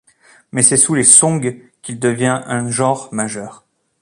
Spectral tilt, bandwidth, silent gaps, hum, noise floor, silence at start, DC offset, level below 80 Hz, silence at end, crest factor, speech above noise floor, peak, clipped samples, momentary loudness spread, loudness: -3.5 dB/octave; 16 kHz; none; none; -50 dBFS; 0.55 s; under 0.1%; -56 dBFS; 0.45 s; 16 dB; 35 dB; 0 dBFS; 0.1%; 20 LU; -13 LUFS